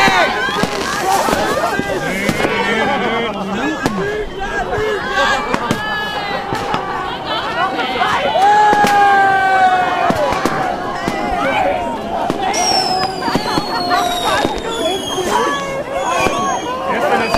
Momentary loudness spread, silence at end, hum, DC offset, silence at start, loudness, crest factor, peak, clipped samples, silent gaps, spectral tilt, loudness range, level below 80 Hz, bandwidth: 8 LU; 0 s; none; under 0.1%; 0 s; -16 LUFS; 16 dB; 0 dBFS; under 0.1%; none; -3.5 dB/octave; 5 LU; -38 dBFS; 16 kHz